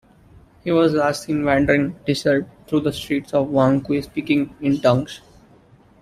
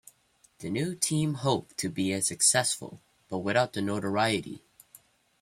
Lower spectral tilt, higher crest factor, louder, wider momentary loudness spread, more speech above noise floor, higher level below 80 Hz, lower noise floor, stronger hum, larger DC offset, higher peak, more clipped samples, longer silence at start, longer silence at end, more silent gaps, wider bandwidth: first, -6.5 dB/octave vs -3.5 dB/octave; about the same, 18 dB vs 20 dB; first, -20 LUFS vs -28 LUFS; second, 7 LU vs 15 LU; second, 32 dB vs 37 dB; first, -48 dBFS vs -66 dBFS; second, -51 dBFS vs -65 dBFS; neither; neither; first, -2 dBFS vs -10 dBFS; neither; about the same, 0.65 s vs 0.6 s; about the same, 0.85 s vs 0.85 s; neither; second, 14.5 kHz vs 16 kHz